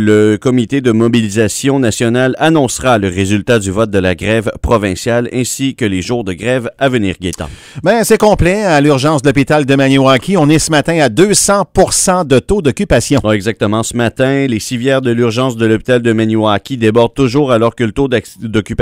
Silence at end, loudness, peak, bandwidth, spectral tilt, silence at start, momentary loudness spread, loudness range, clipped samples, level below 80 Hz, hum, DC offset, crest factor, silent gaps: 0 s; -12 LUFS; 0 dBFS; 16.5 kHz; -5 dB/octave; 0 s; 6 LU; 4 LU; 0.3%; -32 dBFS; none; under 0.1%; 12 dB; none